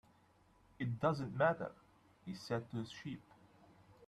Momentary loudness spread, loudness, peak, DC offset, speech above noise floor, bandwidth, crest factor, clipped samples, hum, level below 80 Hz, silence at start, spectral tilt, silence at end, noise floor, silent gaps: 15 LU; -40 LUFS; -22 dBFS; under 0.1%; 31 dB; 12.5 kHz; 20 dB; under 0.1%; none; -72 dBFS; 0.8 s; -7 dB/octave; 0 s; -70 dBFS; none